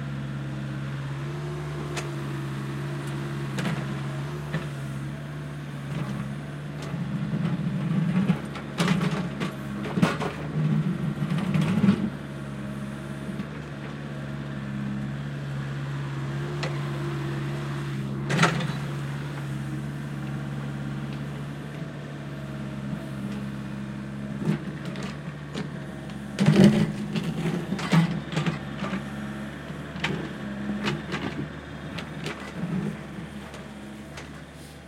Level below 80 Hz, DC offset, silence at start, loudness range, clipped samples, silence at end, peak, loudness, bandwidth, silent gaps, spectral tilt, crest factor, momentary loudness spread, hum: -52 dBFS; under 0.1%; 0 s; 9 LU; under 0.1%; 0 s; -4 dBFS; -29 LUFS; 14 kHz; none; -6.5 dB/octave; 26 dB; 12 LU; none